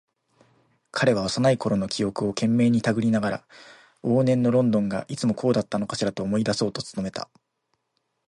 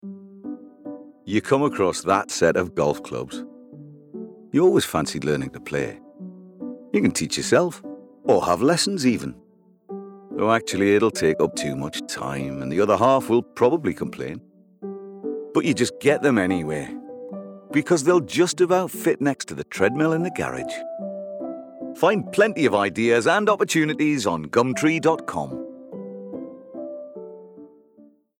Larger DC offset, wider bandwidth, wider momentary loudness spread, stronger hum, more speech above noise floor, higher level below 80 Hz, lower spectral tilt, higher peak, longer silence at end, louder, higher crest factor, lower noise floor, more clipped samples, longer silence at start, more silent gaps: neither; second, 11.5 kHz vs 17.5 kHz; second, 11 LU vs 19 LU; neither; first, 52 dB vs 32 dB; about the same, -58 dBFS vs -60 dBFS; about the same, -6 dB/octave vs -5 dB/octave; second, -8 dBFS vs -2 dBFS; first, 1.05 s vs 0.7 s; about the same, -24 LUFS vs -22 LUFS; about the same, 18 dB vs 20 dB; first, -76 dBFS vs -53 dBFS; neither; first, 0.95 s vs 0.05 s; neither